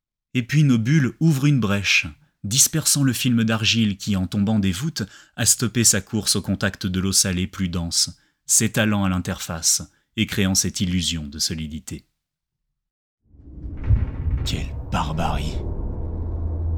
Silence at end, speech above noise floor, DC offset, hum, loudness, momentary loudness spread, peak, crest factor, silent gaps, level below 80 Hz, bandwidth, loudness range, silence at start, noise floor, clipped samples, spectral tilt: 0 s; 60 dB; under 0.1%; none; -21 LUFS; 13 LU; -2 dBFS; 20 dB; 12.91-13.18 s; -34 dBFS; over 20 kHz; 9 LU; 0.35 s; -81 dBFS; under 0.1%; -3.5 dB/octave